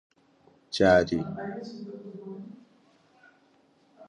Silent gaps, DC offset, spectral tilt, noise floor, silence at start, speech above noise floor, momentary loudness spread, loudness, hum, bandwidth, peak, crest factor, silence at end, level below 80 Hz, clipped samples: none; under 0.1%; -6 dB/octave; -64 dBFS; 0.7 s; 39 dB; 21 LU; -26 LUFS; none; 10.5 kHz; -8 dBFS; 22 dB; 0.05 s; -56 dBFS; under 0.1%